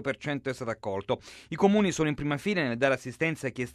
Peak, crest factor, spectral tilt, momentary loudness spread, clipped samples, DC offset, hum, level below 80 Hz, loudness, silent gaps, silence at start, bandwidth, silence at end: -10 dBFS; 20 dB; -5.5 dB/octave; 10 LU; under 0.1%; under 0.1%; none; -58 dBFS; -29 LUFS; none; 0 s; 13.5 kHz; 0.05 s